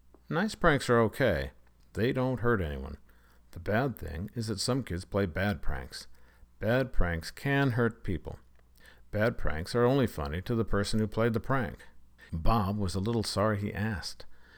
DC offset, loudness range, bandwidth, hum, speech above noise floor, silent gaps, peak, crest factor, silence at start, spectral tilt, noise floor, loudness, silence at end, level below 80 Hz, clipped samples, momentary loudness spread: under 0.1%; 3 LU; 19.5 kHz; none; 27 dB; none; -10 dBFS; 20 dB; 0.3 s; -6 dB/octave; -56 dBFS; -31 LUFS; 0.15 s; -40 dBFS; under 0.1%; 15 LU